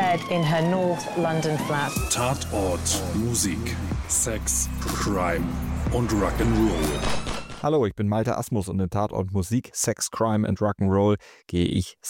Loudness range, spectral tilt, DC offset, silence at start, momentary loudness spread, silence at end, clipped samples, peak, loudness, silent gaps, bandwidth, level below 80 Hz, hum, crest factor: 1 LU; -4.5 dB/octave; under 0.1%; 0 s; 5 LU; 0 s; under 0.1%; -10 dBFS; -25 LUFS; none; 17 kHz; -36 dBFS; none; 14 dB